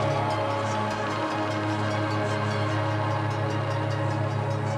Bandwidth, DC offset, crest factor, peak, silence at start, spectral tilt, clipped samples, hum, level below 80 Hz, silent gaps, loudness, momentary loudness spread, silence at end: 10.5 kHz; under 0.1%; 12 dB; -14 dBFS; 0 s; -6.5 dB/octave; under 0.1%; none; -60 dBFS; none; -27 LUFS; 1 LU; 0 s